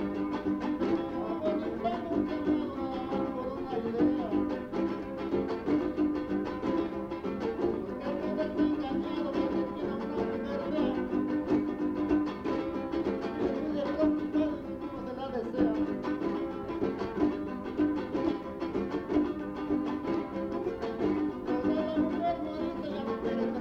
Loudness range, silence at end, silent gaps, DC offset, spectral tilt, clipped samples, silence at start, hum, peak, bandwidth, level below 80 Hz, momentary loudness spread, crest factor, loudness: 1 LU; 0 s; none; under 0.1%; -8 dB/octave; under 0.1%; 0 s; none; -14 dBFS; 6.6 kHz; -54 dBFS; 6 LU; 16 dB; -32 LUFS